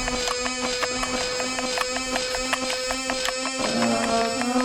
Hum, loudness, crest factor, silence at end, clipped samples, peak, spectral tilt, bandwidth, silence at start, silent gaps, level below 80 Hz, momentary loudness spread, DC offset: none; -24 LUFS; 16 dB; 0 s; under 0.1%; -8 dBFS; -2 dB/octave; 19 kHz; 0 s; none; -46 dBFS; 3 LU; under 0.1%